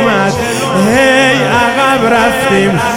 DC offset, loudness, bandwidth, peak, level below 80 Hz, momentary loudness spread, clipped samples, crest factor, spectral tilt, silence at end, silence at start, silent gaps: 0.5%; -9 LUFS; 17 kHz; 0 dBFS; -38 dBFS; 5 LU; under 0.1%; 10 dB; -4.5 dB/octave; 0 s; 0 s; none